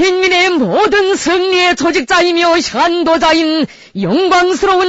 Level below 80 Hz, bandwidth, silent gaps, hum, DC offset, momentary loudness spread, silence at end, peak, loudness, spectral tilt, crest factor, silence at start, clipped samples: -42 dBFS; 8 kHz; none; none; under 0.1%; 4 LU; 0 s; 0 dBFS; -11 LUFS; -3.5 dB/octave; 10 dB; 0 s; under 0.1%